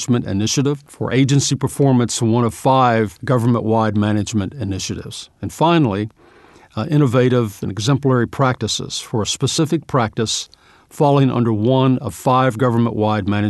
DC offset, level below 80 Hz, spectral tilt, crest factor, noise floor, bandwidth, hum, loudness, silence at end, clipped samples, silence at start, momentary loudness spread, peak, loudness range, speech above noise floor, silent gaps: under 0.1%; -50 dBFS; -5.5 dB/octave; 14 dB; -47 dBFS; 12 kHz; none; -17 LUFS; 0 s; under 0.1%; 0 s; 9 LU; -2 dBFS; 3 LU; 30 dB; none